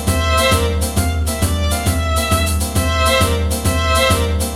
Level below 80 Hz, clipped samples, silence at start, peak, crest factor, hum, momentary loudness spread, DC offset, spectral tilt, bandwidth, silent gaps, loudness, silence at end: -22 dBFS; under 0.1%; 0 s; -2 dBFS; 14 dB; none; 4 LU; under 0.1%; -4 dB/octave; 16.5 kHz; none; -16 LUFS; 0 s